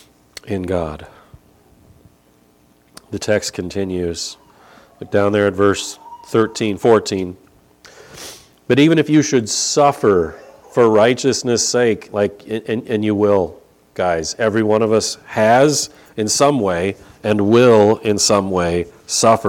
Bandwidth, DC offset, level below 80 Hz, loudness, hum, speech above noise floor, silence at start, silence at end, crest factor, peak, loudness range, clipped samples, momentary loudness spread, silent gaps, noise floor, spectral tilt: 16.5 kHz; under 0.1%; -50 dBFS; -16 LUFS; none; 38 dB; 0.45 s; 0 s; 16 dB; 0 dBFS; 10 LU; under 0.1%; 14 LU; none; -54 dBFS; -4.5 dB/octave